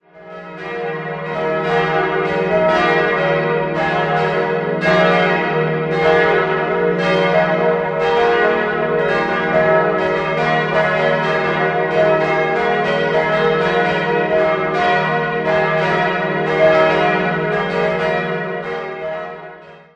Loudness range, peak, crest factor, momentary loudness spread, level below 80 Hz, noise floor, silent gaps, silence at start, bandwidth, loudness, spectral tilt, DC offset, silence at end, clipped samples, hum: 2 LU; 0 dBFS; 16 dB; 10 LU; -48 dBFS; -38 dBFS; none; 0.15 s; 8.6 kHz; -16 LUFS; -6.5 dB/octave; under 0.1%; 0.15 s; under 0.1%; none